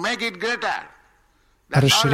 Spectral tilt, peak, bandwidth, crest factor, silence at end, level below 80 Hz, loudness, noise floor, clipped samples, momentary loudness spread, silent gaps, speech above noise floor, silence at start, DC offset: -4 dB/octave; -4 dBFS; 16.5 kHz; 18 dB; 0 s; -52 dBFS; -21 LUFS; -61 dBFS; under 0.1%; 10 LU; none; 40 dB; 0 s; under 0.1%